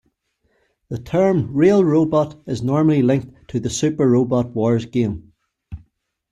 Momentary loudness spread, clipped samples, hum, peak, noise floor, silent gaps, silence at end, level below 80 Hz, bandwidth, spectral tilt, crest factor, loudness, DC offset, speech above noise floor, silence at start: 17 LU; under 0.1%; none; -4 dBFS; -67 dBFS; none; 0.55 s; -50 dBFS; 11 kHz; -7 dB/octave; 16 dB; -18 LUFS; under 0.1%; 49 dB; 0.9 s